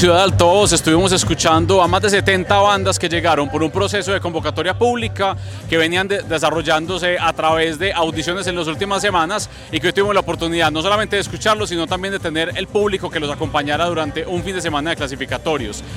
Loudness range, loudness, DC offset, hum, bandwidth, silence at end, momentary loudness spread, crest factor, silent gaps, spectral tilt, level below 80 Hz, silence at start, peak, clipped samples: 5 LU; -17 LUFS; under 0.1%; none; 16.5 kHz; 0 s; 8 LU; 18 dB; none; -4 dB/octave; -38 dBFS; 0 s; 0 dBFS; under 0.1%